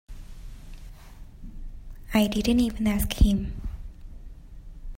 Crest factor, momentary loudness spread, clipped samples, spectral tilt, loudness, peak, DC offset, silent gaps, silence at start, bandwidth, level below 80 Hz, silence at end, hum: 20 dB; 25 LU; under 0.1%; -5.5 dB/octave; -25 LUFS; -8 dBFS; under 0.1%; none; 0.1 s; 16.5 kHz; -32 dBFS; 0 s; none